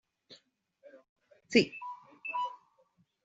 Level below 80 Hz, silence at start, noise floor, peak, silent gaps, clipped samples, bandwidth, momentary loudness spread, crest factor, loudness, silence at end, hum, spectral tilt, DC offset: -76 dBFS; 0.3 s; -71 dBFS; -10 dBFS; 1.09-1.16 s; under 0.1%; 8 kHz; 16 LU; 26 dB; -32 LUFS; 0.7 s; none; -2.5 dB/octave; under 0.1%